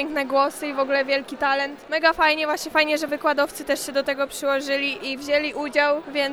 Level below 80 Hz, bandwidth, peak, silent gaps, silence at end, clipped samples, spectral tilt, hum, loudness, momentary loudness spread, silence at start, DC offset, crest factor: -58 dBFS; over 20 kHz; -4 dBFS; none; 0 s; under 0.1%; -2 dB/octave; none; -22 LUFS; 5 LU; 0 s; under 0.1%; 18 dB